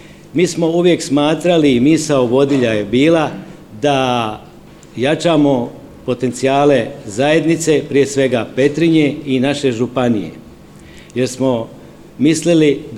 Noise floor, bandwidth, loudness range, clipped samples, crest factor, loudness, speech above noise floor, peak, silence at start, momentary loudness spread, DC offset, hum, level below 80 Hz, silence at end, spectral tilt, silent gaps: -39 dBFS; 13.5 kHz; 4 LU; under 0.1%; 14 dB; -14 LUFS; 25 dB; 0 dBFS; 0 s; 11 LU; 0.2%; none; -48 dBFS; 0 s; -5.5 dB/octave; none